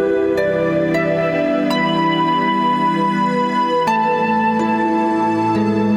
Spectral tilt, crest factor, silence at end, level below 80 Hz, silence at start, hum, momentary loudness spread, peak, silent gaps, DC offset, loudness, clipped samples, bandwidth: -6.5 dB/octave; 12 dB; 0 s; -52 dBFS; 0 s; none; 1 LU; -4 dBFS; none; under 0.1%; -17 LUFS; under 0.1%; 14 kHz